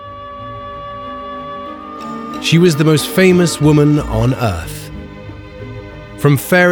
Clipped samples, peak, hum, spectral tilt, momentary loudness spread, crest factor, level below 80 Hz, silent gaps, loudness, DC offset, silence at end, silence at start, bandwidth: under 0.1%; 0 dBFS; none; -6 dB/octave; 20 LU; 14 dB; -34 dBFS; none; -13 LUFS; under 0.1%; 0 s; 0 s; over 20 kHz